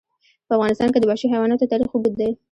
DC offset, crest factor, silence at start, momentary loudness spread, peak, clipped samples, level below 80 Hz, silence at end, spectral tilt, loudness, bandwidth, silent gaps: under 0.1%; 14 dB; 0.5 s; 4 LU; -6 dBFS; under 0.1%; -54 dBFS; 0.15 s; -7 dB/octave; -20 LUFS; 10.5 kHz; none